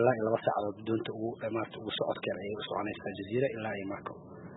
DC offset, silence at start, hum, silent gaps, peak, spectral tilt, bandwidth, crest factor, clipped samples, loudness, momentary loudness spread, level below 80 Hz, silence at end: under 0.1%; 0 s; none; none; -12 dBFS; -9.5 dB/octave; 4.1 kHz; 22 dB; under 0.1%; -34 LUFS; 9 LU; -70 dBFS; 0 s